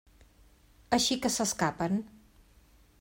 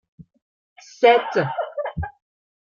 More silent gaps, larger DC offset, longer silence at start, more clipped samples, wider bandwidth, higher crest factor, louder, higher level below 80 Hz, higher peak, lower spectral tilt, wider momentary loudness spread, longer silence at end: second, none vs 0.42-0.76 s; neither; first, 0.9 s vs 0.2 s; neither; first, 16.5 kHz vs 7.2 kHz; about the same, 22 dB vs 20 dB; second, -29 LUFS vs -20 LUFS; second, -58 dBFS vs -48 dBFS; second, -12 dBFS vs -2 dBFS; second, -3 dB/octave vs -5.5 dB/octave; second, 7 LU vs 16 LU; first, 0.95 s vs 0.55 s